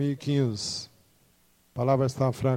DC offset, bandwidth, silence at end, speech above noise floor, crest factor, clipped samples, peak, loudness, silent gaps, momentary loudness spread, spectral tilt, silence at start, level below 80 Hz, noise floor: under 0.1%; 13 kHz; 0 s; 38 dB; 18 dB; under 0.1%; -10 dBFS; -27 LUFS; none; 13 LU; -6.5 dB/octave; 0 s; -60 dBFS; -64 dBFS